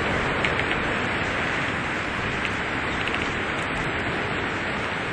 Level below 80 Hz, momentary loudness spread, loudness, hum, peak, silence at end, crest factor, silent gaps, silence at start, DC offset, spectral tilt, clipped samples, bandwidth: -42 dBFS; 3 LU; -25 LUFS; none; -4 dBFS; 0 s; 22 dB; none; 0 s; under 0.1%; -4.5 dB/octave; under 0.1%; 11.5 kHz